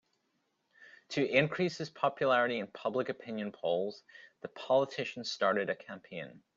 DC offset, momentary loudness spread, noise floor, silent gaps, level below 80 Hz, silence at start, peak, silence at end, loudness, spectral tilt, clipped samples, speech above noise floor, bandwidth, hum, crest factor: under 0.1%; 16 LU; -79 dBFS; none; -76 dBFS; 0.8 s; -12 dBFS; 0.2 s; -33 LUFS; -5 dB/octave; under 0.1%; 45 dB; 7.6 kHz; none; 22 dB